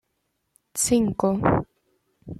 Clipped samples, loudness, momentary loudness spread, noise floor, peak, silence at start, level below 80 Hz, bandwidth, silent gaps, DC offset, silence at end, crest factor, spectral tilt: under 0.1%; -23 LUFS; 11 LU; -75 dBFS; -4 dBFS; 0.75 s; -48 dBFS; 15 kHz; none; under 0.1%; 0.05 s; 22 dB; -5 dB/octave